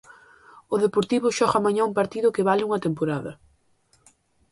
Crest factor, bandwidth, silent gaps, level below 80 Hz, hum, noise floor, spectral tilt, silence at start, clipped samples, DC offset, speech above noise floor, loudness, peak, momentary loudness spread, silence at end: 18 dB; 11.5 kHz; none; -62 dBFS; none; -64 dBFS; -5.5 dB/octave; 0.7 s; under 0.1%; under 0.1%; 41 dB; -23 LUFS; -6 dBFS; 7 LU; 1.15 s